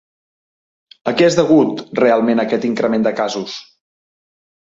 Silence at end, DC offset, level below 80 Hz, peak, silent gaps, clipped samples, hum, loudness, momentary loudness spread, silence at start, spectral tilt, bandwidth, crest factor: 1.05 s; under 0.1%; -60 dBFS; -2 dBFS; none; under 0.1%; none; -16 LUFS; 12 LU; 1.05 s; -5.5 dB/octave; 7.8 kHz; 16 dB